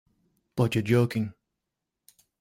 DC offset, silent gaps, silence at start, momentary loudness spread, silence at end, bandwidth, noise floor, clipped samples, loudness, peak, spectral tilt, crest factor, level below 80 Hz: under 0.1%; none; 0.55 s; 13 LU; 1.1 s; 16 kHz; -85 dBFS; under 0.1%; -27 LUFS; -10 dBFS; -7 dB/octave; 20 dB; -60 dBFS